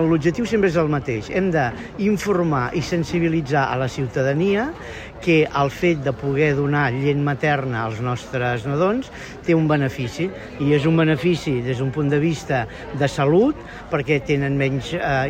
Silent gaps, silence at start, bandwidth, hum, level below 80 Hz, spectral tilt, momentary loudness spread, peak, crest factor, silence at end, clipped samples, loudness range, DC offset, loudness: none; 0 s; 14.5 kHz; none; -44 dBFS; -7 dB/octave; 8 LU; -6 dBFS; 14 dB; 0 s; under 0.1%; 1 LU; under 0.1%; -21 LUFS